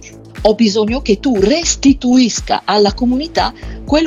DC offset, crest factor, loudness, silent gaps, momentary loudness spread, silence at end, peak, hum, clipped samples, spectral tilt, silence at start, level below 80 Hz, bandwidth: under 0.1%; 14 dB; -13 LUFS; none; 6 LU; 0 s; 0 dBFS; none; under 0.1%; -4 dB/octave; 0 s; -30 dBFS; 8.2 kHz